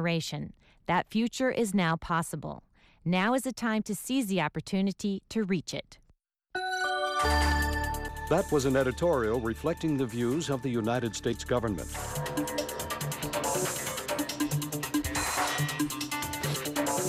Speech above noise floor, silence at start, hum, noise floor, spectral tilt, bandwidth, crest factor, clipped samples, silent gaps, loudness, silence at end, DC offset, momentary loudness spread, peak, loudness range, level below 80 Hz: 39 dB; 0 s; none; -68 dBFS; -4.5 dB/octave; 16 kHz; 14 dB; under 0.1%; none; -30 LUFS; 0 s; under 0.1%; 8 LU; -16 dBFS; 4 LU; -44 dBFS